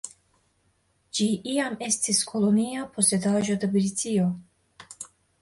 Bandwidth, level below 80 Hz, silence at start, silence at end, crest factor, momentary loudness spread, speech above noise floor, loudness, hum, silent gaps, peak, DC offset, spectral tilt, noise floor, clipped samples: 11.5 kHz; -66 dBFS; 0.05 s; 0.35 s; 18 dB; 18 LU; 44 dB; -25 LUFS; none; none; -8 dBFS; under 0.1%; -4 dB/octave; -68 dBFS; under 0.1%